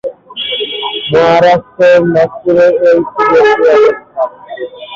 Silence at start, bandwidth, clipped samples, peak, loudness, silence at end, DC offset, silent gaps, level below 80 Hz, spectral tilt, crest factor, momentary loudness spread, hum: 0.05 s; 7.4 kHz; under 0.1%; 0 dBFS; -9 LUFS; 0 s; under 0.1%; none; -48 dBFS; -6 dB/octave; 10 dB; 12 LU; none